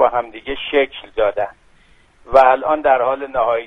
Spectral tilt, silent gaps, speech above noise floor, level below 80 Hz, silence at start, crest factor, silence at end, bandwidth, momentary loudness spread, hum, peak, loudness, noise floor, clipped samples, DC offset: -5.5 dB/octave; none; 35 dB; -44 dBFS; 0 s; 18 dB; 0 s; 6 kHz; 13 LU; none; 0 dBFS; -17 LUFS; -51 dBFS; under 0.1%; under 0.1%